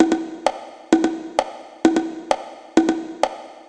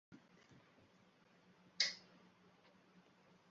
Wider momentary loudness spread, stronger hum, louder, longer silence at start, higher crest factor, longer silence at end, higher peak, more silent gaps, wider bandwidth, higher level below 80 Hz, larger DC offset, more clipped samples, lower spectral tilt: second, 6 LU vs 28 LU; neither; first, -22 LUFS vs -40 LUFS; about the same, 0 s vs 0.1 s; second, 20 dB vs 32 dB; second, 0.05 s vs 1.5 s; first, 0 dBFS vs -20 dBFS; neither; first, 10.5 kHz vs 7.4 kHz; first, -60 dBFS vs under -90 dBFS; neither; neither; first, -4 dB/octave vs 1 dB/octave